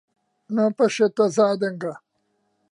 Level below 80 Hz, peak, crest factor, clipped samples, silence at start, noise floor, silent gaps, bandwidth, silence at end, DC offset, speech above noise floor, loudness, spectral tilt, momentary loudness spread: -76 dBFS; -6 dBFS; 16 dB; under 0.1%; 0.5 s; -71 dBFS; none; 11 kHz; 0.75 s; under 0.1%; 50 dB; -21 LUFS; -5.5 dB/octave; 11 LU